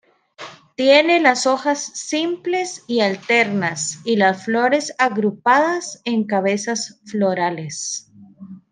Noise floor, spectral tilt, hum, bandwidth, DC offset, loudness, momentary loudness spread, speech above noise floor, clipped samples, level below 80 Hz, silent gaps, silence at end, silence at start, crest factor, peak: -40 dBFS; -3.5 dB/octave; none; 10.5 kHz; under 0.1%; -19 LUFS; 11 LU; 21 dB; under 0.1%; -70 dBFS; none; 0.15 s; 0.4 s; 18 dB; -2 dBFS